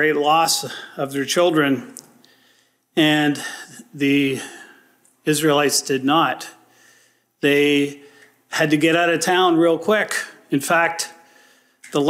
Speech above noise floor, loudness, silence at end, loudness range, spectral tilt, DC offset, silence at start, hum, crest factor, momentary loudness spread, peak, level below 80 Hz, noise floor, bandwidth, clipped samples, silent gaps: 41 dB; -19 LUFS; 0 s; 3 LU; -3.5 dB/octave; under 0.1%; 0 s; none; 16 dB; 13 LU; -4 dBFS; -70 dBFS; -60 dBFS; 16 kHz; under 0.1%; none